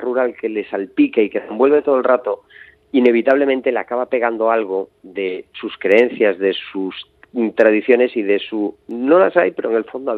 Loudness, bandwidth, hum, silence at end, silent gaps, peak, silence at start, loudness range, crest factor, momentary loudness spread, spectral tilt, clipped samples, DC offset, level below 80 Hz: -17 LUFS; 5.2 kHz; none; 0 s; none; 0 dBFS; 0 s; 2 LU; 16 dB; 12 LU; -7 dB/octave; under 0.1%; under 0.1%; -66 dBFS